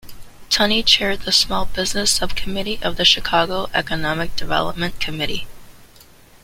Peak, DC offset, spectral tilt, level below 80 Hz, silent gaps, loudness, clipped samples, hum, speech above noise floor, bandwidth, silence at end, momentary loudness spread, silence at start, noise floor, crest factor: 0 dBFS; under 0.1%; -2.5 dB/octave; -36 dBFS; none; -18 LUFS; under 0.1%; none; 28 dB; 16.5 kHz; 0.6 s; 10 LU; 0.05 s; -46 dBFS; 20 dB